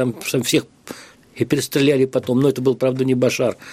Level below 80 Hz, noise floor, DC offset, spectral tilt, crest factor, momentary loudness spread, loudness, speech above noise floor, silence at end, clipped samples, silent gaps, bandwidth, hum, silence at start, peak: -60 dBFS; -38 dBFS; under 0.1%; -5 dB/octave; 18 dB; 18 LU; -19 LUFS; 20 dB; 0 s; under 0.1%; none; 15.5 kHz; none; 0 s; -2 dBFS